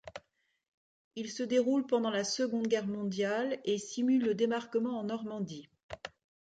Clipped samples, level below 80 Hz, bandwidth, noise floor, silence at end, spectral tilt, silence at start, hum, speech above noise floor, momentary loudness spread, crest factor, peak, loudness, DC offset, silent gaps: under 0.1%; -72 dBFS; 9.2 kHz; -69 dBFS; 0.35 s; -4.5 dB/octave; 0.05 s; none; 37 dB; 18 LU; 16 dB; -18 dBFS; -33 LUFS; under 0.1%; 0.68-1.11 s, 5.83-5.89 s